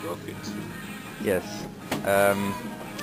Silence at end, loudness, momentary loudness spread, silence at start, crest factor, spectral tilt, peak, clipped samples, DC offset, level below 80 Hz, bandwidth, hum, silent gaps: 0 s; -28 LUFS; 15 LU; 0 s; 20 dB; -4.5 dB/octave; -8 dBFS; under 0.1%; under 0.1%; -56 dBFS; 16 kHz; none; none